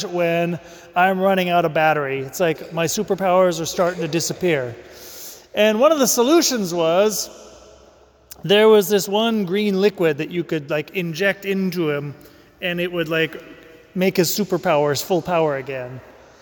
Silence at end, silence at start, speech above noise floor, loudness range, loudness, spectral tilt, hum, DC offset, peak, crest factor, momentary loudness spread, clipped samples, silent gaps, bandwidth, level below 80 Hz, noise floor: 0.3 s; 0 s; 32 dB; 5 LU; -19 LUFS; -4 dB/octave; none; under 0.1%; -4 dBFS; 16 dB; 15 LU; under 0.1%; none; 19 kHz; -58 dBFS; -51 dBFS